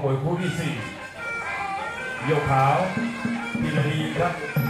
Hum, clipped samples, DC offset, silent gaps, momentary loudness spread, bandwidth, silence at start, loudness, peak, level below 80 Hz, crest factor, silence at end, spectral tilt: none; under 0.1%; under 0.1%; none; 10 LU; 14 kHz; 0 s; -25 LUFS; -8 dBFS; -52 dBFS; 16 dB; 0 s; -6.5 dB/octave